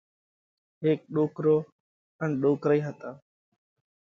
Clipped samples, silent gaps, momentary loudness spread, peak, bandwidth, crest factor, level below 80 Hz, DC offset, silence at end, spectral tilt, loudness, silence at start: under 0.1%; 1.72-2.19 s; 16 LU; -12 dBFS; 7 kHz; 18 dB; -74 dBFS; under 0.1%; 0.9 s; -9.5 dB/octave; -27 LUFS; 0.8 s